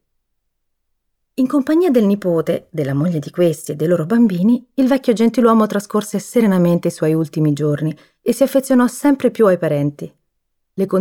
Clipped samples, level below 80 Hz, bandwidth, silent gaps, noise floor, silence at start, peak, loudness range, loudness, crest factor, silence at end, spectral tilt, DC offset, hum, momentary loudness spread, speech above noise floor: under 0.1%; -60 dBFS; 17 kHz; none; -70 dBFS; 1.4 s; -2 dBFS; 3 LU; -16 LUFS; 14 dB; 0 s; -7 dB/octave; under 0.1%; none; 8 LU; 55 dB